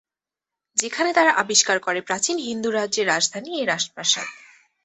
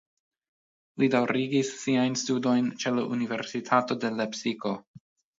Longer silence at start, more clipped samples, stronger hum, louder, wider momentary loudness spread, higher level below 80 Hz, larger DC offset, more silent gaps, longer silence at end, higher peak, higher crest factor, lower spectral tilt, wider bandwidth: second, 0.75 s vs 0.95 s; neither; neither; first, -21 LUFS vs -27 LUFS; about the same, 8 LU vs 7 LU; first, -70 dBFS vs -76 dBFS; neither; second, none vs 4.87-4.94 s; about the same, 0.5 s vs 0.4 s; first, -2 dBFS vs -8 dBFS; about the same, 20 dB vs 20 dB; second, -1 dB/octave vs -4.5 dB/octave; about the same, 8.4 kHz vs 7.8 kHz